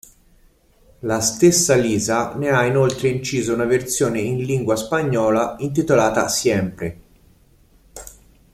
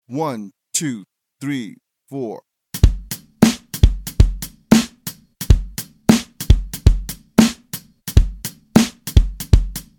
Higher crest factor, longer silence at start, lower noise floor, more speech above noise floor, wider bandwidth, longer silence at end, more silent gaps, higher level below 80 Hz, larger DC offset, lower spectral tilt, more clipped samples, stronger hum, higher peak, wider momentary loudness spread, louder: about the same, 18 dB vs 18 dB; first, 1.05 s vs 0.1 s; first, -54 dBFS vs -36 dBFS; first, 36 dB vs 11 dB; second, 15.5 kHz vs 19 kHz; first, 0.45 s vs 0.15 s; neither; second, -48 dBFS vs -22 dBFS; neither; about the same, -4.5 dB/octave vs -5.5 dB/octave; neither; neither; about the same, -2 dBFS vs 0 dBFS; second, 10 LU vs 16 LU; about the same, -19 LUFS vs -19 LUFS